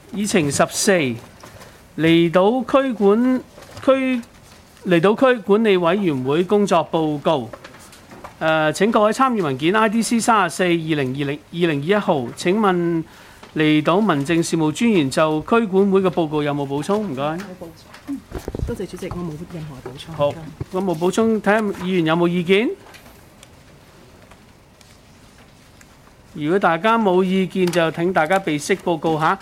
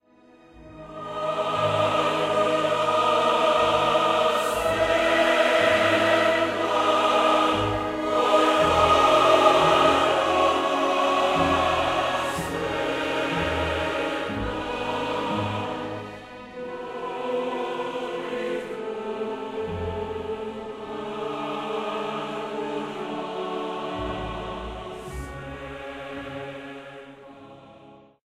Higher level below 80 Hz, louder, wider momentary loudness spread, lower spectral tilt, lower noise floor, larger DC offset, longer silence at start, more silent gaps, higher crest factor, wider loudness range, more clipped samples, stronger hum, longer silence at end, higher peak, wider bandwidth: about the same, -48 dBFS vs -48 dBFS; first, -18 LUFS vs -23 LUFS; about the same, 15 LU vs 16 LU; about the same, -5.5 dB/octave vs -4.5 dB/octave; second, -48 dBFS vs -54 dBFS; neither; second, 0.1 s vs 0.55 s; neither; about the same, 16 dB vs 20 dB; second, 8 LU vs 13 LU; neither; neither; second, 0 s vs 0.3 s; about the same, -4 dBFS vs -4 dBFS; about the same, 16 kHz vs 15.5 kHz